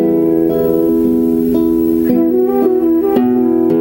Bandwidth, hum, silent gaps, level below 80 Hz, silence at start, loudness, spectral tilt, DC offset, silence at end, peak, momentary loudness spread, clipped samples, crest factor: 16.5 kHz; none; none; -40 dBFS; 0 s; -13 LUFS; -9 dB/octave; under 0.1%; 0 s; -2 dBFS; 1 LU; under 0.1%; 10 dB